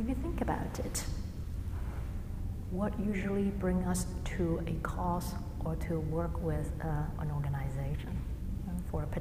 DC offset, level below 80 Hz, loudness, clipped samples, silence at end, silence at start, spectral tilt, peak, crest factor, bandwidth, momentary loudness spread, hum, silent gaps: under 0.1%; -40 dBFS; -36 LUFS; under 0.1%; 0 s; 0 s; -6.5 dB/octave; -18 dBFS; 16 dB; 15.5 kHz; 7 LU; none; none